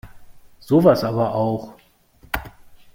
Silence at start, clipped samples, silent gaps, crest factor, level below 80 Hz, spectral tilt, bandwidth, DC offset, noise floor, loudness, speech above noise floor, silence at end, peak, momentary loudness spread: 0.05 s; under 0.1%; none; 20 dB; -46 dBFS; -7.5 dB/octave; 16.5 kHz; under 0.1%; -53 dBFS; -20 LUFS; 35 dB; 0.45 s; -2 dBFS; 15 LU